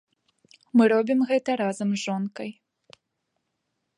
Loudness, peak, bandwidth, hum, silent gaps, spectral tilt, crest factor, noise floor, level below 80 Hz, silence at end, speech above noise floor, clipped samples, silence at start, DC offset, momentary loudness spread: -24 LUFS; -8 dBFS; 11 kHz; none; none; -6 dB/octave; 18 dB; -79 dBFS; -76 dBFS; 1.45 s; 56 dB; under 0.1%; 0.75 s; under 0.1%; 13 LU